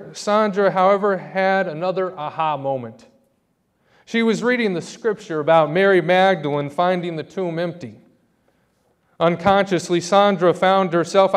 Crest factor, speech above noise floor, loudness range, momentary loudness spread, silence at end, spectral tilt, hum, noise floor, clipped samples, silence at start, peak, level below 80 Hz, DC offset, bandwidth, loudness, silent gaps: 18 dB; 48 dB; 5 LU; 10 LU; 0 s; -5.5 dB/octave; none; -67 dBFS; under 0.1%; 0 s; 0 dBFS; -62 dBFS; under 0.1%; 11.5 kHz; -19 LUFS; none